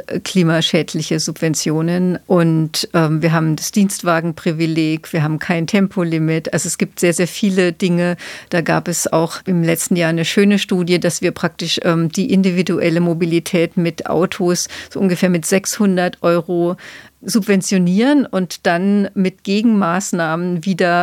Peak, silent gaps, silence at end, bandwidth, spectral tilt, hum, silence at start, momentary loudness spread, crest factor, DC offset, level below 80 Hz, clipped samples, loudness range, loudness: 0 dBFS; none; 0 s; 16.5 kHz; -5 dB/octave; none; 0.1 s; 5 LU; 16 dB; under 0.1%; -58 dBFS; under 0.1%; 1 LU; -16 LUFS